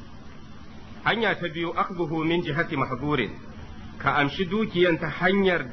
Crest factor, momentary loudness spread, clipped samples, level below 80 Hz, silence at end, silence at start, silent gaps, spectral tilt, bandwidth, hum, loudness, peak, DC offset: 20 dB; 23 LU; under 0.1%; -48 dBFS; 0 s; 0 s; none; -7 dB/octave; 6.4 kHz; none; -25 LUFS; -6 dBFS; under 0.1%